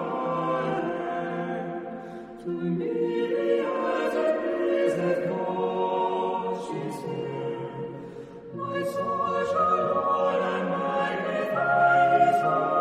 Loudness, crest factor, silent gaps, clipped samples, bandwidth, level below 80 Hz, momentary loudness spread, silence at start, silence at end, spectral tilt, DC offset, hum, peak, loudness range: -26 LUFS; 16 dB; none; under 0.1%; 13.5 kHz; -66 dBFS; 13 LU; 0 s; 0 s; -7 dB/octave; under 0.1%; none; -10 dBFS; 7 LU